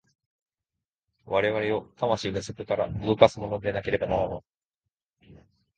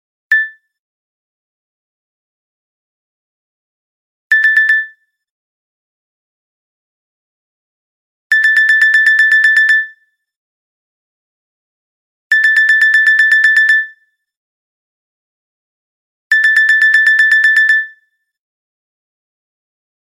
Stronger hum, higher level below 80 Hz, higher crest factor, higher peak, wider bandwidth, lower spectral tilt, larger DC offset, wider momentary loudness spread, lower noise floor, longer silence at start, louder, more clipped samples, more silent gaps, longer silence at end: neither; first, -52 dBFS vs -88 dBFS; first, 28 dB vs 14 dB; about the same, 0 dBFS vs 0 dBFS; second, 9.2 kHz vs 15 kHz; first, -6 dB/octave vs 7 dB/octave; neither; first, 11 LU vs 7 LU; first, -88 dBFS vs -53 dBFS; first, 1.25 s vs 0.3 s; second, -26 LUFS vs -8 LUFS; neither; second, 4.55-4.70 s, 4.91-4.95 s, 5.05-5.09 s vs 0.79-4.30 s, 5.30-8.30 s, 10.36-12.30 s, 14.37-16.30 s; second, 0.45 s vs 2.25 s